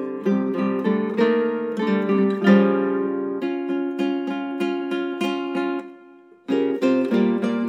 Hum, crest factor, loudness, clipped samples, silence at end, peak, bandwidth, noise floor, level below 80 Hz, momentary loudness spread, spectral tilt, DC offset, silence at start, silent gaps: none; 18 dB; -22 LUFS; under 0.1%; 0 s; -4 dBFS; 8.6 kHz; -48 dBFS; -82 dBFS; 8 LU; -8 dB/octave; under 0.1%; 0 s; none